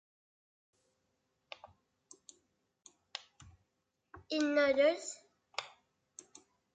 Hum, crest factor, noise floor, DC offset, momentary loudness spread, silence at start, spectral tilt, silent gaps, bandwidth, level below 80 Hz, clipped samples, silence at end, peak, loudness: none; 22 dB; -84 dBFS; under 0.1%; 27 LU; 1.65 s; -2.5 dB/octave; none; 9.4 kHz; -76 dBFS; under 0.1%; 1.1 s; -18 dBFS; -33 LUFS